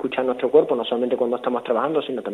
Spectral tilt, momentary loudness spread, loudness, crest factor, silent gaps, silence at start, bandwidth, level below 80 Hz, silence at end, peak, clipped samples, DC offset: -6.5 dB/octave; 6 LU; -21 LUFS; 18 dB; none; 0 s; 9.8 kHz; -66 dBFS; 0 s; -4 dBFS; under 0.1%; under 0.1%